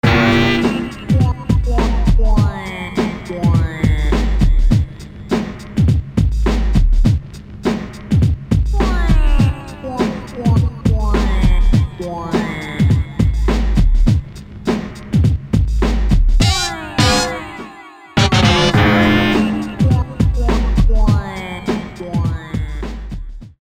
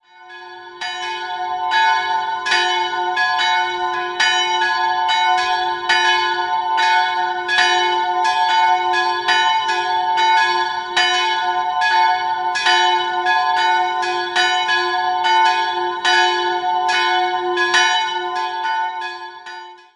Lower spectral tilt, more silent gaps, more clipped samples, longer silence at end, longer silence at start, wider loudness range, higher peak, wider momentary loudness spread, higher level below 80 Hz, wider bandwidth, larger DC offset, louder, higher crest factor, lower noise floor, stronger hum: first, -6 dB/octave vs 0 dB/octave; neither; neither; about the same, 0.1 s vs 0.2 s; second, 0.05 s vs 0.2 s; about the same, 4 LU vs 2 LU; about the same, 0 dBFS vs -2 dBFS; about the same, 11 LU vs 9 LU; first, -18 dBFS vs -64 dBFS; about the same, 12.5 kHz vs 11.5 kHz; neither; about the same, -17 LUFS vs -17 LUFS; about the same, 14 dB vs 16 dB; about the same, -37 dBFS vs -38 dBFS; neither